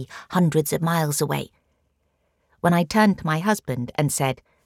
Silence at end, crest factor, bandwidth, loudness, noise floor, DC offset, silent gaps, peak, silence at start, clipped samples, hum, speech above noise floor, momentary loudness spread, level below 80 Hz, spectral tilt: 0.3 s; 18 dB; 17 kHz; -22 LUFS; -70 dBFS; under 0.1%; none; -6 dBFS; 0 s; under 0.1%; none; 48 dB; 7 LU; -56 dBFS; -5.5 dB/octave